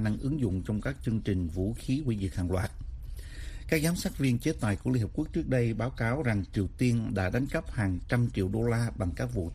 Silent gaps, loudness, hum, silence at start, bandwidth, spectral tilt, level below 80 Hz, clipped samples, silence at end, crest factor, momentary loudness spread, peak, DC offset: none; -30 LUFS; none; 0 s; 15.5 kHz; -7 dB/octave; -42 dBFS; under 0.1%; 0 s; 18 dB; 5 LU; -12 dBFS; under 0.1%